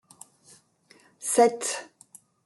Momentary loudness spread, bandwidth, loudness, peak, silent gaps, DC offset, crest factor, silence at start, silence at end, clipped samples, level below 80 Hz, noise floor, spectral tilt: 16 LU; 12.5 kHz; -25 LUFS; -8 dBFS; none; under 0.1%; 22 dB; 1.2 s; 0.6 s; under 0.1%; -80 dBFS; -60 dBFS; -2 dB/octave